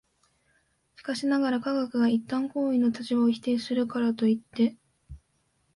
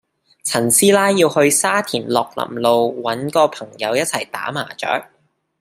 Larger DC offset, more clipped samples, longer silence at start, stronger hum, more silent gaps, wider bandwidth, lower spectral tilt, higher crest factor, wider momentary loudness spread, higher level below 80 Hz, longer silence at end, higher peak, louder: neither; neither; first, 1 s vs 0.45 s; neither; neither; second, 11.5 kHz vs 16 kHz; first, -6 dB/octave vs -3 dB/octave; about the same, 14 dB vs 18 dB; second, 4 LU vs 11 LU; about the same, -60 dBFS vs -64 dBFS; about the same, 0.6 s vs 0.55 s; second, -14 dBFS vs 0 dBFS; second, -27 LUFS vs -17 LUFS